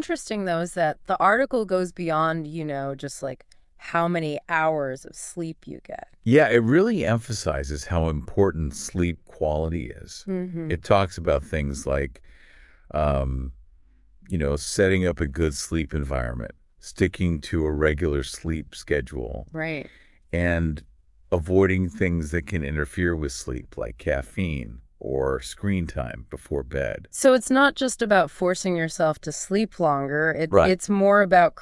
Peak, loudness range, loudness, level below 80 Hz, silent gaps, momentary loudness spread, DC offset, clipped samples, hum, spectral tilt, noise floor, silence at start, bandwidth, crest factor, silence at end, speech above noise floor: -4 dBFS; 6 LU; -24 LUFS; -40 dBFS; none; 14 LU; under 0.1%; under 0.1%; none; -5.5 dB/octave; -54 dBFS; 0 s; 12 kHz; 20 dB; 0 s; 31 dB